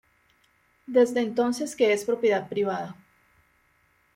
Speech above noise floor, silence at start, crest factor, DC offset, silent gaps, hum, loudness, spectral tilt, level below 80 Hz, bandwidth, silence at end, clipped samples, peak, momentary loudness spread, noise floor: 42 dB; 0.9 s; 18 dB; under 0.1%; none; none; -25 LUFS; -4.5 dB/octave; -70 dBFS; 16 kHz; 1.25 s; under 0.1%; -10 dBFS; 7 LU; -66 dBFS